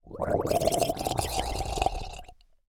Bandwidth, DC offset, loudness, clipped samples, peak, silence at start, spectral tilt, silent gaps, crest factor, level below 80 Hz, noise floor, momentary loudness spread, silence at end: 19 kHz; under 0.1%; -29 LUFS; under 0.1%; -10 dBFS; 0.05 s; -4 dB/octave; none; 20 dB; -40 dBFS; -49 dBFS; 13 LU; 0.35 s